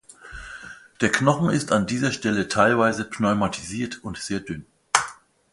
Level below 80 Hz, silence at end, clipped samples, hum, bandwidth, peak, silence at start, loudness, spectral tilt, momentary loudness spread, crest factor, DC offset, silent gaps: -52 dBFS; 0.4 s; under 0.1%; none; 11.5 kHz; -2 dBFS; 0.25 s; -23 LUFS; -4.5 dB/octave; 19 LU; 22 dB; under 0.1%; none